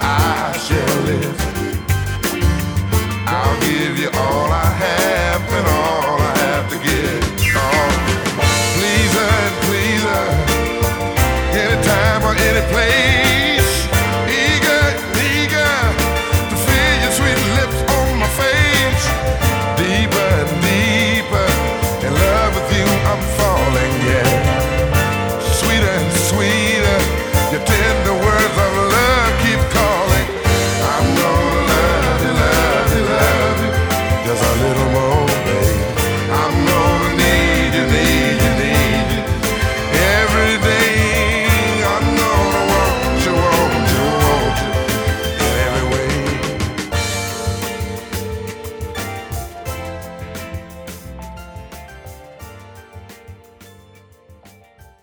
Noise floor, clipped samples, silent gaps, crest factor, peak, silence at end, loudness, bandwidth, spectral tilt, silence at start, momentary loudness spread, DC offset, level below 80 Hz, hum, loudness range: -46 dBFS; under 0.1%; none; 14 dB; 0 dBFS; 0.7 s; -15 LUFS; over 20 kHz; -4.5 dB/octave; 0 s; 8 LU; under 0.1%; -24 dBFS; none; 7 LU